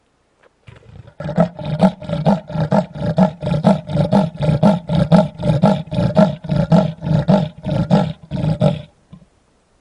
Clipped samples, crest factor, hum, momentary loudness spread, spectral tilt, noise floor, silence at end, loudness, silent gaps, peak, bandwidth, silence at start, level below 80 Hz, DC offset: under 0.1%; 16 dB; none; 7 LU; -9 dB/octave; -57 dBFS; 1 s; -17 LUFS; none; 0 dBFS; 10.5 kHz; 0.9 s; -40 dBFS; under 0.1%